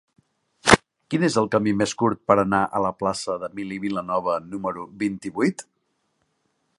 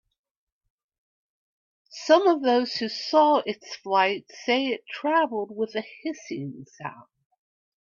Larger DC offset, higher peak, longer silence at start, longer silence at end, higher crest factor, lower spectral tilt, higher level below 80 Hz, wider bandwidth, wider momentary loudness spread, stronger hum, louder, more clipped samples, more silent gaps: neither; first, 0 dBFS vs -6 dBFS; second, 0.65 s vs 1.95 s; first, 1.15 s vs 1 s; about the same, 24 dB vs 22 dB; about the same, -4.5 dB/octave vs -4 dB/octave; first, -50 dBFS vs -76 dBFS; first, 11.5 kHz vs 7.4 kHz; second, 11 LU vs 18 LU; neither; about the same, -23 LUFS vs -24 LUFS; neither; neither